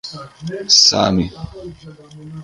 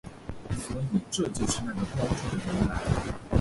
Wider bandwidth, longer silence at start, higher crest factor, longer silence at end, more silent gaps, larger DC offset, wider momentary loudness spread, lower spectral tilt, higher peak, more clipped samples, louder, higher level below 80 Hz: about the same, 11.5 kHz vs 11.5 kHz; about the same, 0.05 s vs 0.05 s; about the same, 18 dB vs 20 dB; about the same, 0 s vs 0 s; neither; neither; first, 26 LU vs 7 LU; second, -3 dB/octave vs -5.5 dB/octave; first, 0 dBFS vs -10 dBFS; neither; first, -12 LUFS vs -30 LUFS; about the same, -42 dBFS vs -40 dBFS